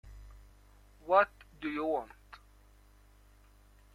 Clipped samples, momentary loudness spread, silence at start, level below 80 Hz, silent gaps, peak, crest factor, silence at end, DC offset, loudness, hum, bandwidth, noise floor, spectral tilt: under 0.1%; 28 LU; 0.05 s; -58 dBFS; none; -12 dBFS; 24 dB; 1.9 s; under 0.1%; -32 LUFS; 50 Hz at -60 dBFS; 14.5 kHz; -61 dBFS; -6 dB/octave